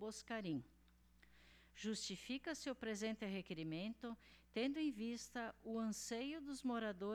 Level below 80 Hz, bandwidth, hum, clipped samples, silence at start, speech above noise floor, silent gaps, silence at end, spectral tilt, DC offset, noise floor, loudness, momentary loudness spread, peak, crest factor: -74 dBFS; 18 kHz; 60 Hz at -70 dBFS; under 0.1%; 0 s; 24 dB; none; 0 s; -4 dB/octave; under 0.1%; -70 dBFS; -46 LUFS; 6 LU; -32 dBFS; 14 dB